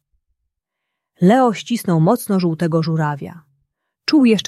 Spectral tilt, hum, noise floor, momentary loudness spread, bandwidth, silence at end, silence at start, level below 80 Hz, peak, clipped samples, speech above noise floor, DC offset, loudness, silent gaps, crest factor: -6.5 dB/octave; none; -79 dBFS; 10 LU; 14 kHz; 0.05 s; 1.2 s; -62 dBFS; -2 dBFS; under 0.1%; 63 dB; under 0.1%; -17 LUFS; none; 16 dB